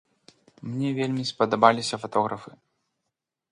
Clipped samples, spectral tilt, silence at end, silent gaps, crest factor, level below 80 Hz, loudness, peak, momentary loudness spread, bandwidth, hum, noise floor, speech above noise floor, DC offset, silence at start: under 0.1%; -5 dB/octave; 1 s; none; 26 dB; -70 dBFS; -25 LUFS; 0 dBFS; 15 LU; 11 kHz; none; -83 dBFS; 59 dB; under 0.1%; 0.65 s